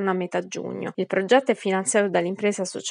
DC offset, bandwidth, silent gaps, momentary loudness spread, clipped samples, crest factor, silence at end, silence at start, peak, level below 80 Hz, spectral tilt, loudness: under 0.1%; 11 kHz; none; 10 LU; under 0.1%; 18 dB; 0 s; 0 s; -6 dBFS; -82 dBFS; -4 dB/octave; -24 LUFS